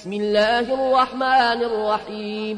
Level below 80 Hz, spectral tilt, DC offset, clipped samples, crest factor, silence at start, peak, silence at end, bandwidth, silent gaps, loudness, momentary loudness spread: -54 dBFS; -4.5 dB/octave; under 0.1%; under 0.1%; 14 dB; 0 s; -6 dBFS; 0 s; 10.5 kHz; none; -20 LUFS; 7 LU